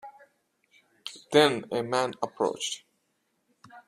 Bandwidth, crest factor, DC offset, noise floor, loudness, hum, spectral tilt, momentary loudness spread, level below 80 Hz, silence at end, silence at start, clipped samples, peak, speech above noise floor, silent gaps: 14 kHz; 24 dB; under 0.1%; -75 dBFS; -27 LUFS; none; -3.5 dB/octave; 20 LU; -72 dBFS; 0.1 s; 0.05 s; under 0.1%; -6 dBFS; 49 dB; none